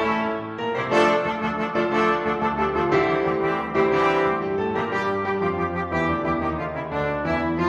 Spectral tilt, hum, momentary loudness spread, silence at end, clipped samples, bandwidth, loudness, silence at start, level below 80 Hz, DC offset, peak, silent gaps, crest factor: -6.5 dB/octave; none; 7 LU; 0 s; under 0.1%; 9.4 kHz; -23 LUFS; 0 s; -46 dBFS; under 0.1%; -6 dBFS; none; 16 dB